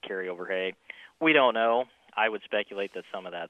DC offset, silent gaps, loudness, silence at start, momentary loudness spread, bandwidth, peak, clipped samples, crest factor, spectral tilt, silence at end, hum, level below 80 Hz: under 0.1%; none; -27 LUFS; 0.05 s; 17 LU; 8.6 kHz; -8 dBFS; under 0.1%; 20 dB; -5.5 dB/octave; 0 s; none; -80 dBFS